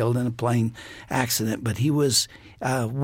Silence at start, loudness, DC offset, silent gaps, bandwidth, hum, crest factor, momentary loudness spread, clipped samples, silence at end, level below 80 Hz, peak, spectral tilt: 0 s; -24 LUFS; under 0.1%; none; 17 kHz; none; 18 dB; 10 LU; under 0.1%; 0 s; -56 dBFS; -6 dBFS; -4.5 dB/octave